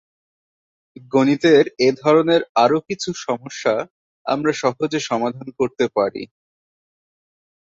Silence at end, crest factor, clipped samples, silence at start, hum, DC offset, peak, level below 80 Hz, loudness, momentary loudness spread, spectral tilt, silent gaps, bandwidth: 1.5 s; 18 dB; under 0.1%; 1.15 s; none; under 0.1%; -2 dBFS; -64 dBFS; -19 LUFS; 11 LU; -5 dB/octave; 2.49-2.55 s, 3.90-4.25 s; 7.8 kHz